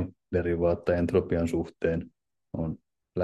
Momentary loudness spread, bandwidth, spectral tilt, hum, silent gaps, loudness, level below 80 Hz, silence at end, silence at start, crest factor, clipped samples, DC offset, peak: 13 LU; 12 kHz; -8.5 dB/octave; none; none; -29 LUFS; -52 dBFS; 0 s; 0 s; 18 dB; under 0.1%; under 0.1%; -10 dBFS